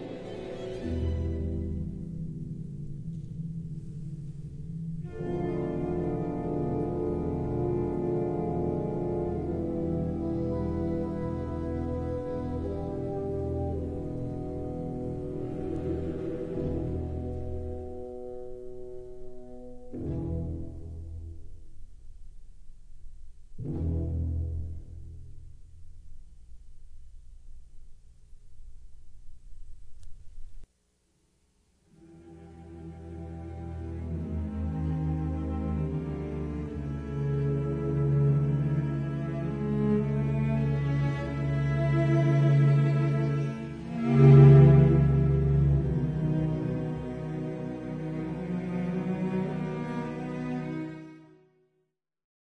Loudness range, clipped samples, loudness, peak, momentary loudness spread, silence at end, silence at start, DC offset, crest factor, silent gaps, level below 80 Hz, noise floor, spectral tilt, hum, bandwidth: 19 LU; under 0.1%; -29 LUFS; -6 dBFS; 17 LU; 1.2 s; 0 s; under 0.1%; 22 dB; none; -42 dBFS; -78 dBFS; -10 dB/octave; none; 4.5 kHz